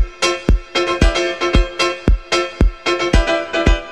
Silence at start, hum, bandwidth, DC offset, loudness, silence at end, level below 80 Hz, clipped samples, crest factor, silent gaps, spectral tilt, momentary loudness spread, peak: 0 s; none; 11 kHz; 0.5%; -17 LUFS; 0 s; -18 dBFS; under 0.1%; 16 dB; none; -4.5 dB/octave; 3 LU; 0 dBFS